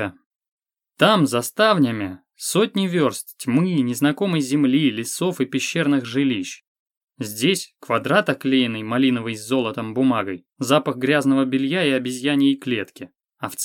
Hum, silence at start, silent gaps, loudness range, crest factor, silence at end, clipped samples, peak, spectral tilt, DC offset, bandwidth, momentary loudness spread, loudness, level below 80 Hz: none; 0 s; 0.26-0.40 s, 0.48-0.57 s, 6.67-6.86 s, 6.97-7.07 s; 2 LU; 18 dB; 0 s; under 0.1%; -2 dBFS; -5 dB/octave; under 0.1%; 17 kHz; 11 LU; -20 LUFS; -72 dBFS